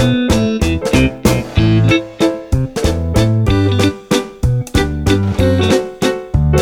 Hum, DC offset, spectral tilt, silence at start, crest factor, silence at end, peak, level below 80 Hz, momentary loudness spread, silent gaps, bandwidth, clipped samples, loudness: none; under 0.1%; -6 dB/octave; 0 s; 14 dB; 0 s; 0 dBFS; -24 dBFS; 5 LU; none; 17.5 kHz; under 0.1%; -14 LUFS